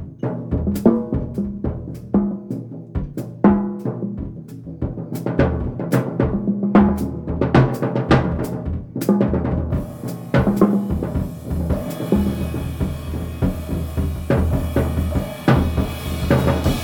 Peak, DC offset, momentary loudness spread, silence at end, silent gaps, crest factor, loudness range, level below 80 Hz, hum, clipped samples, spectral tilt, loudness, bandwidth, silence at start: -2 dBFS; under 0.1%; 11 LU; 0 s; none; 18 dB; 4 LU; -30 dBFS; none; under 0.1%; -8 dB/octave; -21 LUFS; 20 kHz; 0 s